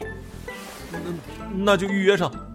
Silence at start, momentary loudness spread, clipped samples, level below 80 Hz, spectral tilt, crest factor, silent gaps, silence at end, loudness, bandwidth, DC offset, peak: 0 s; 16 LU; under 0.1%; -44 dBFS; -5.5 dB/octave; 20 dB; none; 0 s; -23 LUFS; 16 kHz; under 0.1%; -6 dBFS